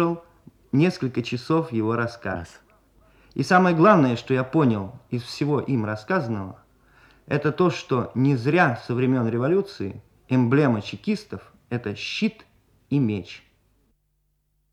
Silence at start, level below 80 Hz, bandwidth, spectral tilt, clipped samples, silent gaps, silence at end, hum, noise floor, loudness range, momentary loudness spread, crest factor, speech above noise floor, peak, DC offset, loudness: 0 s; -60 dBFS; 11.5 kHz; -7.5 dB/octave; under 0.1%; none; 1.35 s; none; -70 dBFS; 5 LU; 13 LU; 20 dB; 48 dB; -4 dBFS; under 0.1%; -23 LUFS